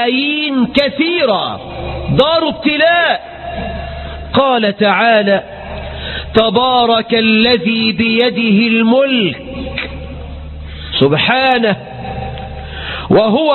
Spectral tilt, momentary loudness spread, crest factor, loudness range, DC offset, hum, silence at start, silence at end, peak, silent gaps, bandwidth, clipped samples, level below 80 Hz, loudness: -8 dB/octave; 15 LU; 14 dB; 4 LU; under 0.1%; none; 0 s; 0 s; 0 dBFS; none; 4.4 kHz; under 0.1%; -32 dBFS; -12 LUFS